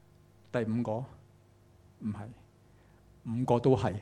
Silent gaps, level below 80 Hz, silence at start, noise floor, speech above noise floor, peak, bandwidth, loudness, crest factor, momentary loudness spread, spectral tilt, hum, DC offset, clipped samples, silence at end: none; -62 dBFS; 0.55 s; -61 dBFS; 30 dB; -12 dBFS; 11 kHz; -32 LUFS; 22 dB; 20 LU; -8.5 dB/octave; 50 Hz at -60 dBFS; under 0.1%; under 0.1%; 0 s